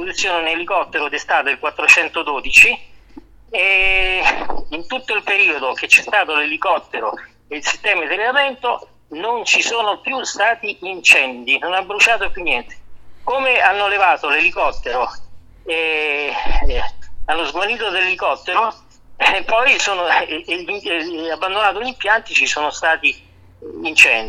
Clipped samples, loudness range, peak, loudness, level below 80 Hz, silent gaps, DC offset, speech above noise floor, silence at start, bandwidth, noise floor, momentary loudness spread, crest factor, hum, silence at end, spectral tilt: under 0.1%; 5 LU; 0 dBFS; -16 LUFS; -34 dBFS; none; under 0.1%; 25 dB; 0 s; 14.5 kHz; -41 dBFS; 13 LU; 18 dB; none; 0 s; -1.5 dB/octave